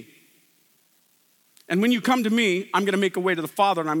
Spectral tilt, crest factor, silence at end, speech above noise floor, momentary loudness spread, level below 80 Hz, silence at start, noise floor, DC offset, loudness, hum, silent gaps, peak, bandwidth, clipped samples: -5 dB/octave; 18 dB; 0 s; 41 dB; 4 LU; -86 dBFS; 0 s; -63 dBFS; under 0.1%; -22 LUFS; none; none; -6 dBFS; 18 kHz; under 0.1%